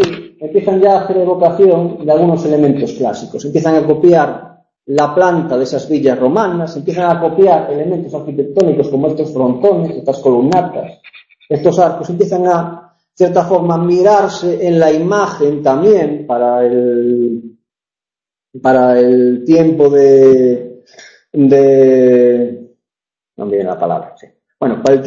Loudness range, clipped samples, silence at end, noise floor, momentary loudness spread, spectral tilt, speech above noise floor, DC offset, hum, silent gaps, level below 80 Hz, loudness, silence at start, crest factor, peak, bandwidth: 5 LU; under 0.1%; 0 s; -90 dBFS; 10 LU; -7.5 dB/octave; 79 dB; under 0.1%; none; none; -54 dBFS; -12 LUFS; 0 s; 12 dB; 0 dBFS; 7.6 kHz